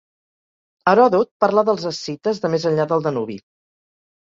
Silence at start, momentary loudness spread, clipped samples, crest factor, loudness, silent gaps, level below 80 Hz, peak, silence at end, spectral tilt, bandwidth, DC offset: 0.85 s; 12 LU; under 0.1%; 18 dB; -19 LUFS; 1.31-1.40 s; -64 dBFS; -2 dBFS; 0.85 s; -6 dB/octave; 7.6 kHz; under 0.1%